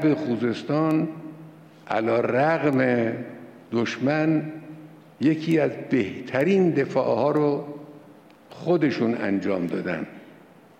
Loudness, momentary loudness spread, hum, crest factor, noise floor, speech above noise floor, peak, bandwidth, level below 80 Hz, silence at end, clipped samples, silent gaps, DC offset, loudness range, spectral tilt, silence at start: -24 LUFS; 17 LU; none; 14 dB; -50 dBFS; 27 dB; -10 dBFS; 8.8 kHz; -68 dBFS; 0.45 s; under 0.1%; none; under 0.1%; 2 LU; -7.5 dB/octave; 0 s